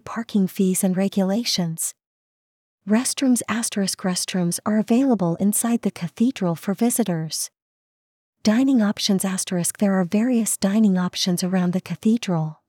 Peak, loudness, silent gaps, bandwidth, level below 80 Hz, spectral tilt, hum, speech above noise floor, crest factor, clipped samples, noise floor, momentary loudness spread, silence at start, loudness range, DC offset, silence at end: -6 dBFS; -21 LUFS; 2.06-2.78 s, 7.62-8.33 s; 18.5 kHz; -68 dBFS; -4.5 dB/octave; none; over 69 dB; 16 dB; under 0.1%; under -90 dBFS; 6 LU; 0.05 s; 3 LU; under 0.1%; 0.15 s